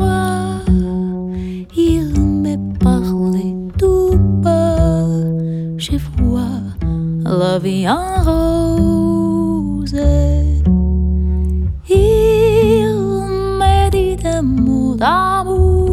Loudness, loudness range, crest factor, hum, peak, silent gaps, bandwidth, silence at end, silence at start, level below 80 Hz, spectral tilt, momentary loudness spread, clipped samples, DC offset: -15 LUFS; 3 LU; 14 dB; none; 0 dBFS; none; 14.5 kHz; 0 s; 0 s; -20 dBFS; -7.5 dB/octave; 7 LU; under 0.1%; under 0.1%